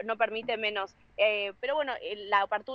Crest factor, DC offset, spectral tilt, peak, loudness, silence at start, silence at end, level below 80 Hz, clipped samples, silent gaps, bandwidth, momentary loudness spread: 20 dB; under 0.1%; -4 dB/octave; -12 dBFS; -30 LUFS; 0 s; 0 s; -70 dBFS; under 0.1%; none; 6.8 kHz; 8 LU